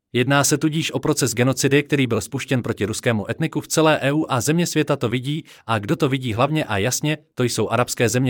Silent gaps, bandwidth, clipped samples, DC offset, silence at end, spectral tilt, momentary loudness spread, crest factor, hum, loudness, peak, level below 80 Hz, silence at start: none; 19 kHz; under 0.1%; under 0.1%; 0 s; -4.5 dB/octave; 7 LU; 16 dB; none; -20 LUFS; -4 dBFS; -58 dBFS; 0.15 s